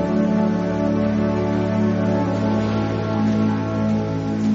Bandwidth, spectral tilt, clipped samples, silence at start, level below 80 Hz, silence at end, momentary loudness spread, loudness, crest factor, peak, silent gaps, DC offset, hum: 7.4 kHz; -7.5 dB/octave; under 0.1%; 0 s; -42 dBFS; 0 s; 3 LU; -20 LUFS; 10 dB; -8 dBFS; none; under 0.1%; none